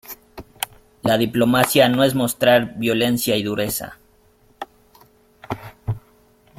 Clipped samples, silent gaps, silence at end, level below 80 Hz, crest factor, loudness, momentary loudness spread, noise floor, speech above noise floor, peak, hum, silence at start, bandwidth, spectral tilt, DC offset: under 0.1%; none; 0.6 s; -52 dBFS; 20 dB; -19 LUFS; 22 LU; -56 dBFS; 38 dB; -2 dBFS; none; 0.1 s; 16.5 kHz; -4.5 dB/octave; under 0.1%